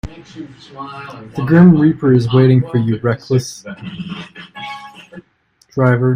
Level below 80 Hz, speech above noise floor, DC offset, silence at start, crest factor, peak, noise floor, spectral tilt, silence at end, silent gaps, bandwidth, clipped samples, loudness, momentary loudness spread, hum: -46 dBFS; 43 dB; under 0.1%; 0.05 s; 14 dB; 0 dBFS; -57 dBFS; -8 dB/octave; 0 s; none; 10.5 kHz; under 0.1%; -13 LUFS; 23 LU; none